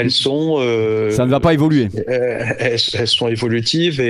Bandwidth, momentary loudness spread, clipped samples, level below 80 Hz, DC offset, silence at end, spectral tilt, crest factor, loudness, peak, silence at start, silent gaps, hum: 14 kHz; 5 LU; under 0.1%; -44 dBFS; under 0.1%; 0 s; -5.5 dB/octave; 16 dB; -16 LUFS; 0 dBFS; 0 s; none; none